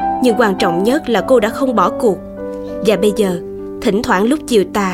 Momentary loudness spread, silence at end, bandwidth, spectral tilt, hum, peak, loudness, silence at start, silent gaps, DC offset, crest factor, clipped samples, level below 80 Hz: 11 LU; 0 s; 16.5 kHz; -5.5 dB/octave; none; 0 dBFS; -15 LUFS; 0 s; none; under 0.1%; 14 dB; under 0.1%; -42 dBFS